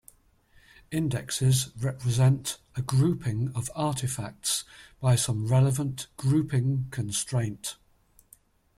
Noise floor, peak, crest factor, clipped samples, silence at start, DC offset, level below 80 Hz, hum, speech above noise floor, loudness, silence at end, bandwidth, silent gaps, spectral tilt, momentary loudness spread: -62 dBFS; -12 dBFS; 16 dB; under 0.1%; 0.9 s; under 0.1%; -56 dBFS; none; 36 dB; -27 LUFS; 1.05 s; 15 kHz; none; -5 dB/octave; 9 LU